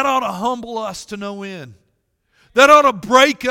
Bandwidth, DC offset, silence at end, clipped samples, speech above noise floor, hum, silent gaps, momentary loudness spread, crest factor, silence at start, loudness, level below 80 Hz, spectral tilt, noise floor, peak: 17.5 kHz; under 0.1%; 0 s; 0.2%; 51 dB; none; none; 20 LU; 16 dB; 0 s; -14 LUFS; -54 dBFS; -3 dB/octave; -67 dBFS; 0 dBFS